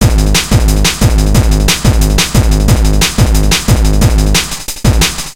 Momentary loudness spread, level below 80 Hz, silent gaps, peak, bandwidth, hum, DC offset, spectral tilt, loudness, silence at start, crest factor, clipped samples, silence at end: 2 LU; -12 dBFS; none; 0 dBFS; 17 kHz; none; under 0.1%; -4 dB/octave; -10 LUFS; 0 s; 8 dB; 0.4%; 0 s